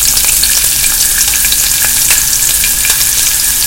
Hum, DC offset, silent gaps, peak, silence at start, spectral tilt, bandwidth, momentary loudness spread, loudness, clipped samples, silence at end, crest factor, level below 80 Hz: none; under 0.1%; none; 0 dBFS; 0 s; 1.5 dB/octave; over 20 kHz; 1 LU; -7 LUFS; 0.9%; 0 s; 10 dB; -28 dBFS